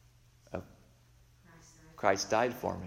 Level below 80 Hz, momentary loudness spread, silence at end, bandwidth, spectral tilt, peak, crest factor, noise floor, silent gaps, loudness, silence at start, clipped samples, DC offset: -64 dBFS; 16 LU; 0 s; 16 kHz; -4 dB/octave; -12 dBFS; 24 dB; -63 dBFS; none; -33 LUFS; 0.5 s; under 0.1%; under 0.1%